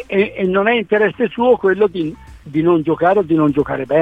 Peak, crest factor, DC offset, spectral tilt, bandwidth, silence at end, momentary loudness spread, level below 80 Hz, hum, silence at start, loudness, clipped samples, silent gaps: -2 dBFS; 14 dB; 0.1%; -8.5 dB/octave; 4.9 kHz; 0 s; 5 LU; -46 dBFS; none; 0 s; -16 LUFS; under 0.1%; none